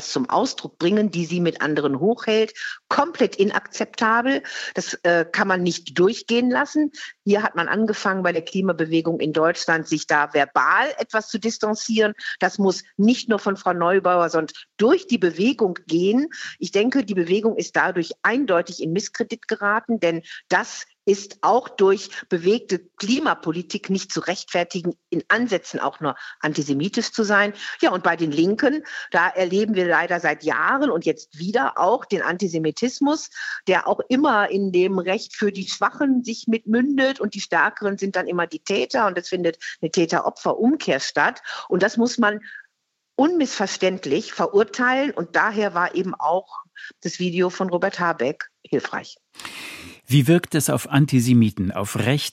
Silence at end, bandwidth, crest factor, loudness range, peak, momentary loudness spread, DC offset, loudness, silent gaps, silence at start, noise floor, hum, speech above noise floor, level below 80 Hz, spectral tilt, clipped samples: 0 s; 16 kHz; 20 dB; 3 LU; -2 dBFS; 8 LU; under 0.1%; -21 LUFS; none; 0 s; -76 dBFS; none; 55 dB; -68 dBFS; -5 dB/octave; under 0.1%